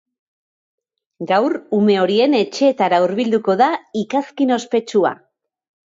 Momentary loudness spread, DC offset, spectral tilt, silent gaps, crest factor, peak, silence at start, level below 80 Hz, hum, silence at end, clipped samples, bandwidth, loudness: 7 LU; under 0.1%; -5.5 dB/octave; none; 16 dB; -2 dBFS; 1.2 s; -68 dBFS; none; 0.7 s; under 0.1%; 7.8 kHz; -17 LUFS